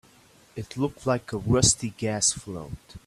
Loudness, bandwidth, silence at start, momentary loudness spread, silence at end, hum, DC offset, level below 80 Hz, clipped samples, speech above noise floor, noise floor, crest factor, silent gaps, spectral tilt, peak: -24 LUFS; 14 kHz; 0.55 s; 19 LU; 0.1 s; none; under 0.1%; -48 dBFS; under 0.1%; 30 dB; -56 dBFS; 22 dB; none; -3.5 dB/octave; -4 dBFS